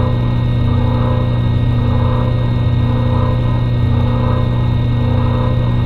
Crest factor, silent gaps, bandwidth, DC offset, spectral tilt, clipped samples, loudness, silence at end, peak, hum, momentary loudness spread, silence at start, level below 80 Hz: 10 dB; none; 4.5 kHz; under 0.1%; -9.5 dB/octave; under 0.1%; -15 LUFS; 0 s; -4 dBFS; none; 1 LU; 0 s; -22 dBFS